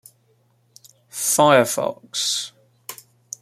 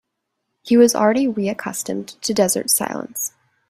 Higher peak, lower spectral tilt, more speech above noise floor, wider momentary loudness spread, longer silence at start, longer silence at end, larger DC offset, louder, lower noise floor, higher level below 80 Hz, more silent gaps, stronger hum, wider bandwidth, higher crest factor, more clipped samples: about the same, -2 dBFS vs -2 dBFS; about the same, -2.5 dB/octave vs -3.5 dB/octave; second, 43 dB vs 58 dB; first, 23 LU vs 12 LU; first, 1.15 s vs 0.65 s; about the same, 0.5 s vs 0.4 s; neither; about the same, -19 LUFS vs -19 LUFS; second, -62 dBFS vs -76 dBFS; second, -70 dBFS vs -62 dBFS; neither; neither; about the same, 16 kHz vs 16 kHz; about the same, 20 dB vs 18 dB; neither